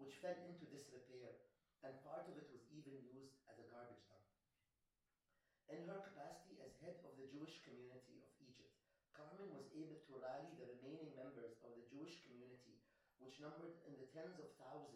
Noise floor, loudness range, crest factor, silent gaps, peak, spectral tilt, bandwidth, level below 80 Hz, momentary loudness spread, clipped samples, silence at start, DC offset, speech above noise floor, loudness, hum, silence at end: under -90 dBFS; 4 LU; 22 dB; none; -38 dBFS; -5.5 dB/octave; 12.5 kHz; under -90 dBFS; 11 LU; under 0.1%; 0 s; under 0.1%; over 32 dB; -59 LUFS; none; 0 s